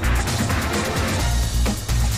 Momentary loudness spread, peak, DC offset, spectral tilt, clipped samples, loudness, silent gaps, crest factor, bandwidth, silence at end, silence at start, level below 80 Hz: 1 LU; -10 dBFS; under 0.1%; -4.5 dB/octave; under 0.1%; -22 LUFS; none; 10 dB; 16 kHz; 0 s; 0 s; -24 dBFS